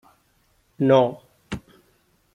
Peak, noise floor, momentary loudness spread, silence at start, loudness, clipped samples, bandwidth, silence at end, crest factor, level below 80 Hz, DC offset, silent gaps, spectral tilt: -4 dBFS; -64 dBFS; 19 LU; 0.8 s; -20 LUFS; under 0.1%; 10.5 kHz; 0.75 s; 20 dB; -56 dBFS; under 0.1%; none; -7.5 dB/octave